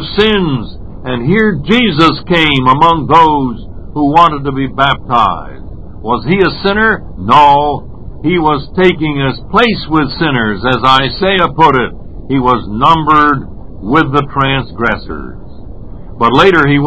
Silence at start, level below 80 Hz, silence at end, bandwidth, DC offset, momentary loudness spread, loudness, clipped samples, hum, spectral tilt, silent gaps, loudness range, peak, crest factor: 0 s; -30 dBFS; 0 s; 8 kHz; 4%; 15 LU; -10 LUFS; 0.9%; none; -7 dB/octave; none; 3 LU; 0 dBFS; 12 dB